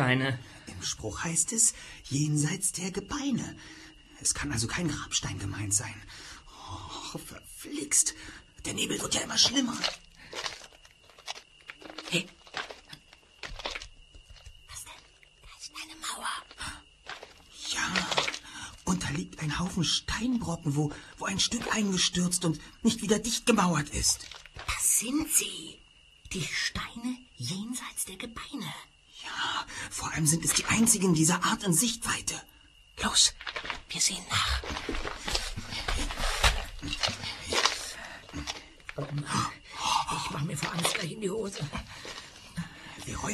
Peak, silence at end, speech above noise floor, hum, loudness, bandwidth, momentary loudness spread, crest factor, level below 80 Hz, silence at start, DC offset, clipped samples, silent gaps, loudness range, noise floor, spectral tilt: -6 dBFS; 0 s; 26 dB; none; -29 LUFS; 13.5 kHz; 19 LU; 26 dB; -46 dBFS; 0 s; under 0.1%; under 0.1%; none; 11 LU; -56 dBFS; -2.5 dB/octave